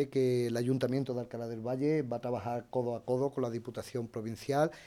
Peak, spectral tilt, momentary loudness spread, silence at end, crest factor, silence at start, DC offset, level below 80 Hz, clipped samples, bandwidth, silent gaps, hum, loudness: -16 dBFS; -7 dB/octave; 9 LU; 0 s; 18 dB; 0 s; under 0.1%; -68 dBFS; under 0.1%; 16 kHz; none; none; -34 LUFS